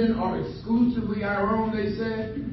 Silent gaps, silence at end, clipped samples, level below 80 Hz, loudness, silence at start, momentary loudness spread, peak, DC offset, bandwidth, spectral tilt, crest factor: none; 0 s; under 0.1%; -44 dBFS; -26 LUFS; 0 s; 6 LU; -12 dBFS; under 0.1%; 5.8 kHz; -9.5 dB/octave; 14 dB